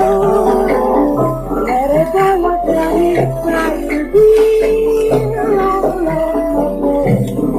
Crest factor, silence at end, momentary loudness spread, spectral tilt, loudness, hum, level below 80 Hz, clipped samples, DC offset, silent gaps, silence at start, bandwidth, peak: 12 dB; 0 s; 6 LU; -7.5 dB/octave; -13 LUFS; none; -30 dBFS; under 0.1%; under 0.1%; none; 0 s; 14.5 kHz; 0 dBFS